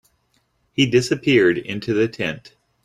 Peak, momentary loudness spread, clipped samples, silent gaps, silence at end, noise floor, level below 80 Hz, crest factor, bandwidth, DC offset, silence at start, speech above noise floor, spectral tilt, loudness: -4 dBFS; 11 LU; under 0.1%; none; 0.35 s; -66 dBFS; -56 dBFS; 18 dB; 13 kHz; under 0.1%; 0.8 s; 47 dB; -5.5 dB/octave; -19 LUFS